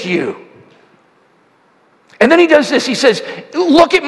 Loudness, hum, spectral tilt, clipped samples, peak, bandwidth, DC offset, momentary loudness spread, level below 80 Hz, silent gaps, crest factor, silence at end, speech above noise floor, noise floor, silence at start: -12 LUFS; none; -4 dB/octave; 0.3%; 0 dBFS; 12 kHz; under 0.1%; 14 LU; -52 dBFS; none; 14 dB; 0 s; 41 dB; -52 dBFS; 0 s